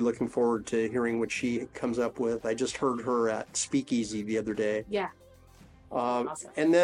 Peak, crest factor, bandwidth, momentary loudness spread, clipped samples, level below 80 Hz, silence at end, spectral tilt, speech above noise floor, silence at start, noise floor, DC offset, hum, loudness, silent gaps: -12 dBFS; 16 dB; 11 kHz; 4 LU; under 0.1%; -62 dBFS; 0 s; -4.5 dB/octave; 26 dB; 0 s; -55 dBFS; under 0.1%; none; -30 LUFS; none